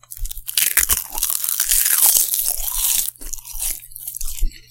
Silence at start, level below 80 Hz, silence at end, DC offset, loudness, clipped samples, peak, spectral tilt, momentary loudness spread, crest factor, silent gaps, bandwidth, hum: 0.1 s; -30 dBFS; 0.1 s; under 0.1%; -16 LUFS; under 0.1%; 0 dBFS; 1.5 dB/octave; 18 LU; 20 dB; none; 18 kHz; none